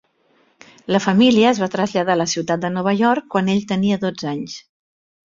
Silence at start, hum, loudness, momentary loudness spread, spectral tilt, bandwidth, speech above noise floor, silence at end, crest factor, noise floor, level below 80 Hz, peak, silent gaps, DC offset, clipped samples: 0.9 s; none; -18 LUFS; 12 LU; -5 dB/octave; 7.6 kHz; 42 dB; 0.65 s; 18 dB; -60 dBFS; -58 dBFS; -2 dBFS; none; under 0.1%; under 0.1%